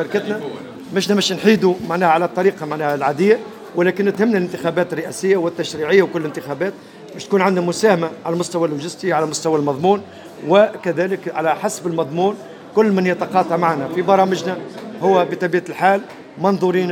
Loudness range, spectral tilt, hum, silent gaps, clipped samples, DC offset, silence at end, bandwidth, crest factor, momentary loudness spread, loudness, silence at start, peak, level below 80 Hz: 2 LU; -5.5 dB/octave; none; none; under 0.1%; under 0.1%; 0 s; 17 kHz; 18 dB; 10 LU; -18 LUFS; 0 s; 0 dBFS; -66 dBFS